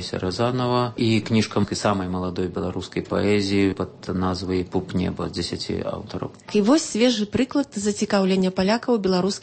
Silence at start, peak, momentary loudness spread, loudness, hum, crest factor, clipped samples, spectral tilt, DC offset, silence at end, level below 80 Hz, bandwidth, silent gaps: 0 s; -6 dBFS; 8 LU; -23 LUFS; none; 16 dB; under 0.1%; -5.5 dB/octave; under 0.1%; 0 s; -50 dBFS; 8.8 kHz; none